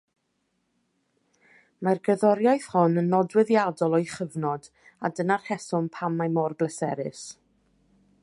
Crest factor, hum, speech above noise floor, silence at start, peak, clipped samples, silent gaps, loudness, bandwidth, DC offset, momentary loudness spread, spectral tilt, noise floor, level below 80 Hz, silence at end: 20 dB; none; 50 dB; 1.8 s; -6 dBFS; under 0.1%; none; -25 LUFS; 11.5 kHz; under 0.1%; 11 LU; -7 dB/octave; -75 dBFS; -72 dBFS; 0.9 s